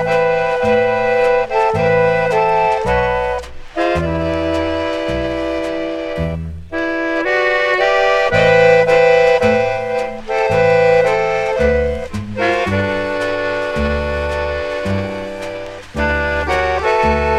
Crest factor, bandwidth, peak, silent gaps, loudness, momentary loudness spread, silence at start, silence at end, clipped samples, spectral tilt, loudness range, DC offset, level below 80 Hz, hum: 16 dB; 11 kHz; 0 dBFS; none; -15 LUFS; 10 LU; 0 s; 0 s; under 0.1%; -6 dB/octave; 7 LU; under 0.1%; -32 dBFS; none